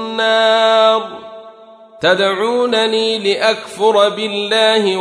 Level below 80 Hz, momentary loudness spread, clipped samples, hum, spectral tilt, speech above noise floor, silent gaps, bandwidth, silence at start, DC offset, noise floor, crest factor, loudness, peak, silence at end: -66 dBFS; 7 LU; under 0.1%; none; -3 dB/octave; 26 dB; none; 11 kHz; 0 s; under 0.1%; -40 dBFS; 14 dB; -14 LUFS; 0 dBFS; 0 s